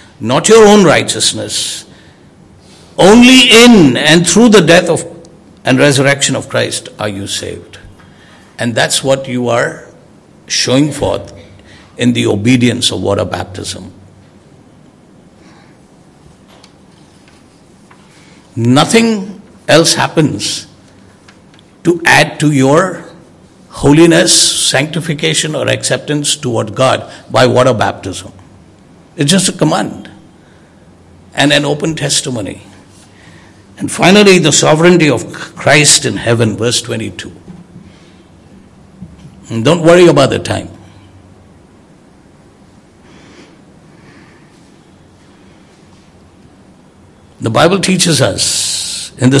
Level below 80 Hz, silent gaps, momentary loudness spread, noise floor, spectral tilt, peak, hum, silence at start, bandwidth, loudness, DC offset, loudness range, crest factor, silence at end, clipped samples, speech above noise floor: -44 dBFS; none; 16 LU; -42 dBFS; -4 dB/octave; 0 dBFS; none; 0.2 s; 12 kHz; -9 LUFS; under 0.1%; 10 LU; 12 dB; 0 s; 2%; 33 dB